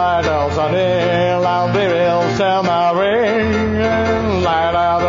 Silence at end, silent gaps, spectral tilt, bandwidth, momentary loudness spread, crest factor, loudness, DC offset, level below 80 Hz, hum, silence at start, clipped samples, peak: 0 s; none; -4.5 dB/octave; 7.4 kHz; 2 LU; 10 dB; -15 LUFS; under 0.1%; -38 dBFS; none; 0 s; under 0.1%; -4 dBFS